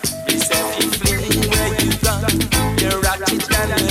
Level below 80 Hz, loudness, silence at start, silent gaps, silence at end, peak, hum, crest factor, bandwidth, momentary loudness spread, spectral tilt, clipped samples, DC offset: -28 dBFS; -17 LUFS; 0 s; none; 0 s; -4 dBFS; none; 14 dB; 16.5 kHz; 2 LU; -3.5 dB/octave; under 0.1%; under 0.1%